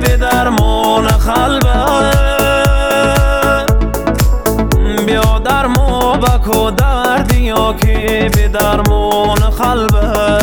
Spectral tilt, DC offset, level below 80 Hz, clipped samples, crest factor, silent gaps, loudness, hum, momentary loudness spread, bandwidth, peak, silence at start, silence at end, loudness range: -5.5 dB/octave; 0.1%; -14 dBFS; under 0.1%; 10 dB; none; -12 LUFS; none; 2 LU; over 20 kHz; 0 dBFS; 0 s; 0 s; 1 LU